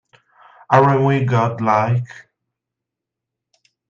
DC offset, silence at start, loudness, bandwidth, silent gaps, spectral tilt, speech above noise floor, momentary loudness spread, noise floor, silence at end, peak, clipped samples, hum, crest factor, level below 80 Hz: under 0.1%; 0.7 s; -16 LUFS; 7.2 kHz; none; -8 dB/octave; 68 dB; 8 LU; -83 dBFS; 1.7 s; 0 dBFS; under 0.1%; none; 18 dB; -58 dBFS